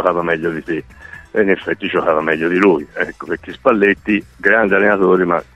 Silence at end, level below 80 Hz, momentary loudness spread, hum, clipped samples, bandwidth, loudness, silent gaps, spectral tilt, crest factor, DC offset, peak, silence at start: 0.15 s; -48 dBFS; 12 LU; none; under 0.1%; 8.4 kHz; -16 LUFS; none; -7 dB/octave; 16 dB; under 0.1%; 0 dBFS; 0 s